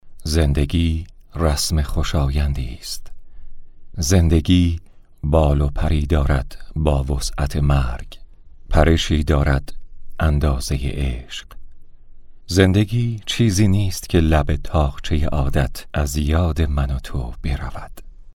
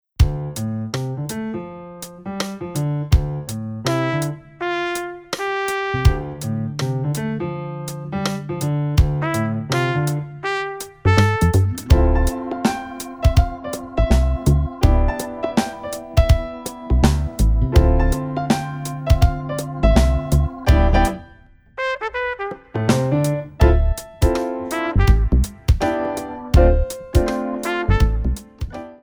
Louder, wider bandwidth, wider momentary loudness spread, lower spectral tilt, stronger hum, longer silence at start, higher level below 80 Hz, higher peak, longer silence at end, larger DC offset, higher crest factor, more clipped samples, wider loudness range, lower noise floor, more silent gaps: about the same, -20 LUFS vs -20 LUFS; second, 16.5 kHz vs over 20 kHz; about the same, 13 LU vs 11 LU; about the same, -6 dB/octave vs -6.5 dB/octave; neither; second, 0.05 s vs 0.2 s; about the same, -24 dBFS vs -22 dBFS; about the same, 0 dBFS vs 0 dBFS; about the same, 0.05 s vs 0.05 s; neither; about the same, 18 dB vs 18 dB; neither; about the same, 4 LU vs 4 LU; second, -39 dBFS vs -47 dBFS; neither